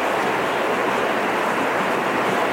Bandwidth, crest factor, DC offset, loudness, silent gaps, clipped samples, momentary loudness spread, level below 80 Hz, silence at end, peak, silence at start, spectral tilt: 17 kHz; 12 dB; under 0.1%; -21 LUFS; none; under 0.1%; 0 LU; -58 dBFS; 0 s; -8 dBFS; 0 s; -4 dB/octave